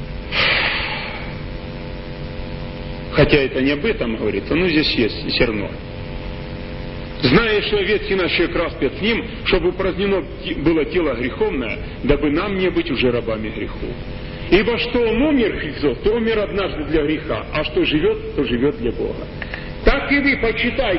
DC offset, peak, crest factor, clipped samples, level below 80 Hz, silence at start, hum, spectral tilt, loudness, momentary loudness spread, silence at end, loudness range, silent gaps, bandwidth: under 0.1%; 0 dBFS; 20 dB; under 0.1%; -32 dBFS; 0 s; none; -10 dB/octave; -19 LUFS; 14 LU; 0 s; 3 LU; none; 5.8 kHz